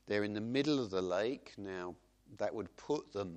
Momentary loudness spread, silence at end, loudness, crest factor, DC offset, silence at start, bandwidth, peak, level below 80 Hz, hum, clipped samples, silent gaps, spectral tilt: 11 LU; 0 s; -38 LUFS; 18 dB; under 0.1%; 0.05 s; 9 kHz; -20 dBFS; -72 dBFS; none; under 0.1%; none; -5.5 dB/octave